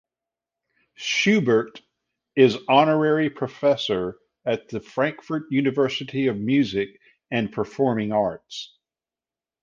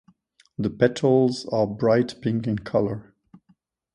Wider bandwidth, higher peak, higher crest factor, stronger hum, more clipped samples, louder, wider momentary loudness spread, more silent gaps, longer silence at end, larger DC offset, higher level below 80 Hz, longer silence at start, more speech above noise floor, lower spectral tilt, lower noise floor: second, 7.4 kHz vs 10.5 kHz; about the same, -4 dBFS vs -6 dBFS; about the same, 20 dB vs 18 dB; neither; neither; about the same, -23 LUFS vs -23 LUFS; first, 14 LU vs 10 LU; neither; about the same, 0.95 s vs 0.95 s; neither; second, -62 dBFS vs -56 dBFS; first, 1 s vs 0.6 s; first, over 68 dB vs 42 dB; second, -5.5 dB/octave vs -7 dB/octave; first, under -90 dBFS vs -64 dBFS